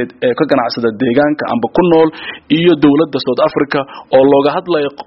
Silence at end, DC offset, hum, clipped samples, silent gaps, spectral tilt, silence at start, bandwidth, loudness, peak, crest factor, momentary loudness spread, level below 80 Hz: 0.05 s; under 0.1%; none; under 0.1%; none; -4.5 dB/octave; 0 s; 5.8 kHz; -12 LUFS; 0 dBFS; 12 dB; 7 LU; -50 dBFS